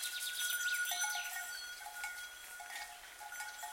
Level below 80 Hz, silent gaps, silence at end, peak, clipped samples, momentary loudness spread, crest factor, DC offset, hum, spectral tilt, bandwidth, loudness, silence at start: -76 dBFS; none; 0 s; -24 dBFS; under 0.1%; 13 LU; 18 dB; under 0.1%; none; 3.5 dB/octave; 16.5 kHz; -40 LUFS; 0 s